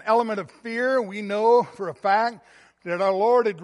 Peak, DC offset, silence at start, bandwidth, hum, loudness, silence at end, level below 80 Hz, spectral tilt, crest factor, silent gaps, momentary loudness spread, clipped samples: -8 dBFS; under 0.1%; 0.05 s; 11 kHz; none; -23 LUFS; 0 s; -76 dBFS; -5.5 dB/octave; 14 dB; none; 12 LU; under 0.1%